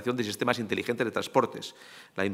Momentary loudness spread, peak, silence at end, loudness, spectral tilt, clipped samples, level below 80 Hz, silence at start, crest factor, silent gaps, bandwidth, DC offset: 14 LU; -6 dBFS; 0 s; -29 LUFS; -4.5 dB/octave; under 0.1%; -76 dBFS; 0 s; 24 dB; none; 16 kHz; under 0.1%